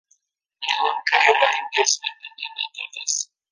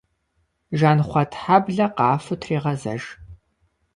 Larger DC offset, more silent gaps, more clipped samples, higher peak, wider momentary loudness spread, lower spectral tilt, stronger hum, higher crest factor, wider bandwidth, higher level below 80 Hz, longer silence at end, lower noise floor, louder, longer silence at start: neither; neither; neither; about the same, -2 dBFS vs -2 dBFS; about the same, 14 LU vs 12 LU; second, 3 dB/octave vs -7.5 dB/octave; neither; about the same, 22 dB vs 20 dB; about the same, 10.5 kHz vs 11 kHz; second, -78 dBFS vs -52 dBFS; second, 0.25 s vs 0.6 s; about the same, -68 dBFS vs -70 dBFS; about the same, -21 LUFS vs -21 LUFS; about the same, 0.6 s vs 0.7 s